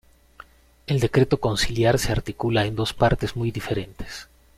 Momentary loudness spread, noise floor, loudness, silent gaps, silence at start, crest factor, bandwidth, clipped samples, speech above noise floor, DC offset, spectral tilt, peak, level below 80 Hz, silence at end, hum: 16 LU; -49 dBFS; -23 LUFS; none; 0.9 s; 18 dB; 15.5 kHz; under 0.1%; 27 dB; under 0.1%; -5.5 dB/octave; -6 dBFS; -38 dBFS; 0.35 s; none